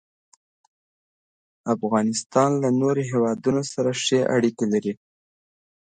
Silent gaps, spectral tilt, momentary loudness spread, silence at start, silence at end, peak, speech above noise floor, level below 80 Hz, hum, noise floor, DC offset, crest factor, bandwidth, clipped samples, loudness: 2.26-2.30 s; -5 dB/octave; 6 LU; 1.65 s; 0.9 s; -6 dBFS; over 68 dB; -66 dBFS; none; under -90 dBFS; under 0.1%; 18 dB; 9.4 kHz; under 0.1%; -22 LUFS